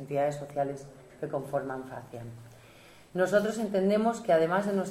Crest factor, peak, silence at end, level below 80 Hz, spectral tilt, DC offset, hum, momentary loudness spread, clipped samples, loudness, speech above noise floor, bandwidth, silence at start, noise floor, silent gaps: 18 dB; -12 dBFS; 0 s; -66 dBFS; -6 dB/octave; under 0.1%; none; 18 LU; under 0.1%; -29 LUFS; 25 dB; 15.5 kHz; 0 s; -54 dBFS; none